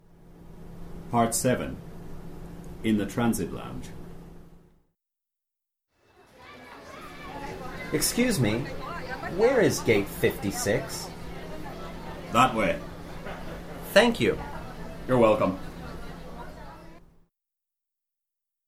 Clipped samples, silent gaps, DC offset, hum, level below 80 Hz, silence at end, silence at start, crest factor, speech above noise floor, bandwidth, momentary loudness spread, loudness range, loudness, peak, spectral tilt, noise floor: under 0.1%; none; under 0.1%; none; -46 dBFS; 1.7 s; 0.2 s; 24 dB; 62 dB; 16.5 kHz; 22 LU; 11 LU; -26 LUFS; -6 dBFS; -4.5 dB/octave; -87 dBFS